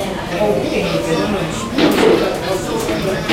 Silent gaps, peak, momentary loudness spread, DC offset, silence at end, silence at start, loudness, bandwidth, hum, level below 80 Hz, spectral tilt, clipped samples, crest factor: none; 0 dBFS; 7 LU; under 0.1%; 0 s; 0 s; -17 LUFS; 16 kHz; none; -36 dBFS; -5 dB/octave; under 0.1%; 16 dB